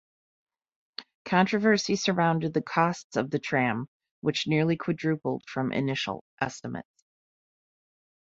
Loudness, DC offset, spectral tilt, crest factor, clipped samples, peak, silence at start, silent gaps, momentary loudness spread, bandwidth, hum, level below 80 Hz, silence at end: -27 LUFS; under 0.1%; -5.5 dB/octave; 22 dB; under 0.1%; -8 dBFS; 1 s; 1.15-1.25 s, 3.04-3.10 s, 3.88-4.00 s, 4.11-4.22 s, 6.21-6.37 s; 15 LU; 8 kHz; none; -66 dBFS; 1.55 s